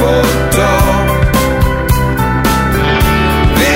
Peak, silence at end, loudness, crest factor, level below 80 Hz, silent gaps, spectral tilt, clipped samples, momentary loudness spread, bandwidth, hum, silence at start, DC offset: 0 dBFS; 0 s; -11 LUFS; 10 dB; -16 dBFS; none; -5 dB/octave; under 0.1%; 2 LU; 16.5 kHz; none; 0 s; under 0.1%